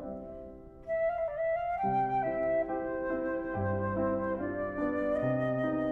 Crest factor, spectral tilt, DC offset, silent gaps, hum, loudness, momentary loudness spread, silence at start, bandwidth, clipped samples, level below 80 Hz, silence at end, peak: 12 dB; -10 dB/octave; under 0.1%; none; none; -32 LUFS; 9 LU; 0 s; 4.4 kHz; under 0.1%; -54 dBFS; 0 s; -20 dBFS